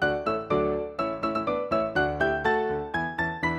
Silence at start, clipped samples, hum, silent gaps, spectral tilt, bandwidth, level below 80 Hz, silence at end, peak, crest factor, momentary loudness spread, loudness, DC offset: 0 s; under 0.1%; none; none; -7 dB/octave; 10 kHz; -48 dBFS; 0 s; -12 dBFS; 16 dB; 4 LU; -27 LUFS; under 0.1%